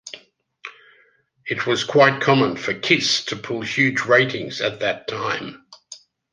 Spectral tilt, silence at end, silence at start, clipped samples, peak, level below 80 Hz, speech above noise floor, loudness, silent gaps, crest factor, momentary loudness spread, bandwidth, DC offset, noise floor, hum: -4 dB/octave; 0.35 s; 0.05 s; under 0.1%; -2 dBFS; -64 dBFS; 39 dB; -19 LUFS; none; 20 dB; 23 LU; 10 kHz; under 0.1%; -59 dBFS; none